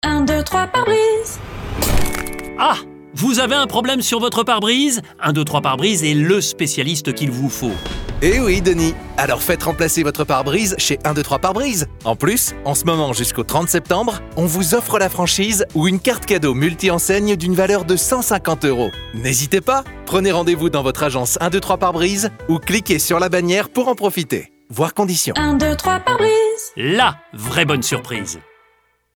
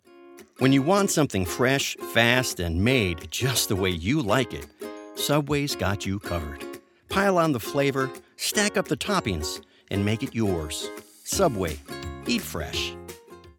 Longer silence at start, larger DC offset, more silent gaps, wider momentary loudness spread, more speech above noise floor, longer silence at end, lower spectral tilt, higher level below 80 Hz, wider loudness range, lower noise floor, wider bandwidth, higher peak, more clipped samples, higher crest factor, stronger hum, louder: about the same, 0.05 s vs 0.15 s; neither; neither; second, 6 LU vs 15 LU; first, 42 dB vs 24 dB; first, 0.75 s vs 0.1 s; about the same, -4 dB/octave vs -4.5 dB/octave; first, -34 dBFS vs -46 dBFS; second, 2 LU vs 5 LU; first, -59 dBFS vs -49 dBFS; about the same, over 20 kHz vs 19 kHz; about the same, -2 dBFS vs -4 dBFS; neither; second, 16 dB vs 22 dB; neither; first, -17 LUFS vs -25 LUFS